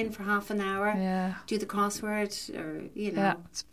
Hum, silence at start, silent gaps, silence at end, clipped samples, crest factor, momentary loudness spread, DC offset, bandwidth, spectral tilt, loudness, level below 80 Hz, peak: none; 0 s; none; 0.1 s; under 0.1%; 18 dB; 7 LU; 0.1%; 15.5 kHz; -5 dB/octave; -31 LUFS; -62 dBFS; -12 dBFS